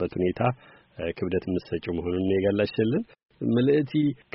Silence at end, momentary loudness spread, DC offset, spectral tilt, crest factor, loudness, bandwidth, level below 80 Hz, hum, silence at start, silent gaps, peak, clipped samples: 0.2 s; 10 LU; under 0.1%; -6.5 dB/octave; 18 dB; -26 LUFS; 5.8 kHz; -54 dBFS; none; 0 s; 3.25-3.29 s; -8 dBFS; under 0.1%